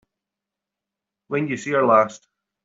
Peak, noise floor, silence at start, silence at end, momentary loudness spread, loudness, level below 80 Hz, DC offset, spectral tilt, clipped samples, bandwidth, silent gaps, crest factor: -4 dBFS; -86 dBFS; 1.3 s; 0.45 s; 10 LU; -20 LUFS; -70 dBFS; under 0.1%; -6 dB/octave; under 0.1%; 7.8 kHz; none; 20 dB